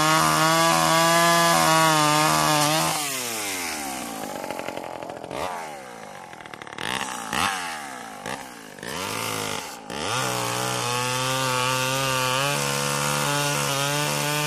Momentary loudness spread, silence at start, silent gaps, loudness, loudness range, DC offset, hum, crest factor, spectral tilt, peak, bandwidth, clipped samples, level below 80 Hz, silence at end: 17 LU; 0 s; none; -22 LUFS; 12 LU; under 0.1%; none; 18 dB; -2.5 dB/octave; -4 dBFS; 15.5 kHz; under 0.1%; -58 dBFS; 0 s